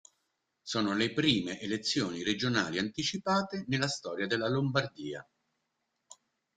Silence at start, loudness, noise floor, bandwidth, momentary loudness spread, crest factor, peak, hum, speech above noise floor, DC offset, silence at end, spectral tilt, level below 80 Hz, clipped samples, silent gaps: 0.65 s; -31 LUFS; -82 dBFS; 9.4 kHz; 8 LU; 22 dB; -12 dBFS; none; 50 dB; under 0.1%; 0.45 s; -4.5 dB/octave; -68 dBFS; under 0.1%; none